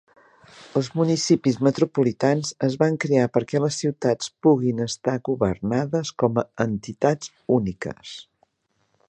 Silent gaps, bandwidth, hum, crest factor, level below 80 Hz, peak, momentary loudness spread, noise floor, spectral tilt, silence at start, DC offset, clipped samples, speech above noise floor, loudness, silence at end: none; 10 kHz; none; 18 dB; -56 dBFS; -4 dBFS; 7 LU; -71 dBFS; -6 dB/octave; 0.55 s; under 0.1%; under 0.1%; 49 dB; -23 LUFS; 0.85 s